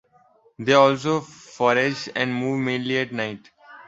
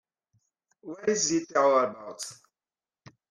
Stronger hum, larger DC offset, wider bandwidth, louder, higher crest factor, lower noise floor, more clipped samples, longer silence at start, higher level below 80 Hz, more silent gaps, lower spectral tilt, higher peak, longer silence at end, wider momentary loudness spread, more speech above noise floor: neither; neither; second, 8 kHz vs 13 kHz; first, -22 LUFS vs -26 LUFS; about the same, 20 dB vs 18 dB; second, -58 dBFS vs under -90 dBFS; neither; second, 0.6 s vs 0.85 s; first, -64 dBFS vs -74 dBFS; neither; first, -5 dB/octave vs -2.5 dB/octave; first, -2 dBFS vs -12 dBFS; second, 0.05 s vs 0.95 s; second, 13 LU vs 16 LU; second, 37 dB vs over 63 dB